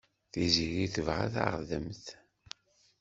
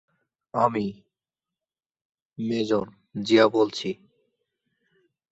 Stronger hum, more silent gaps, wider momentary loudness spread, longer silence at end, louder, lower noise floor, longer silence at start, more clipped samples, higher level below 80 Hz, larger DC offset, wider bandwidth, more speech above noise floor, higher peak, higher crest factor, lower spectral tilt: neither; second, none vs 2.05-2.13 s, 2.22-2.30 s; first, 21 LU vs 15 LU; second, 0.85 s vs 1.4 s; second, -32 LUFS vs -24 LUFS; second, -53 dBFS vs under -90 dBFS; second, 0.35 s vs 0.55 s; neither; first, -54 dBFS vs -68 dBFS; neither; about the same, 8 kHz vs 8 kHz; second, 21 dB vs over 67 dB; second, -10 dBFS vs -6 dBFS; about the same, 24 dB vs 22 dB; about the same, -4.5 dB/octave vs -5.5 dB/octave